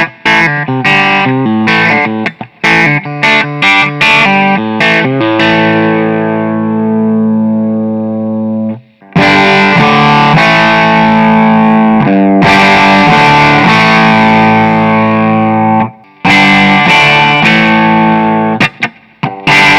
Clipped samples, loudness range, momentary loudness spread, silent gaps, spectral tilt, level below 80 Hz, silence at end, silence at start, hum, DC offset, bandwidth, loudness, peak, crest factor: 0.4%; 5 LU; 9 LU; none; -5.5 dB/octave; -40 dBFS; 0 s; 0 s; none; under 0.1%; 11 kHz; -7 LUFS; 0 dBFS; 8 dB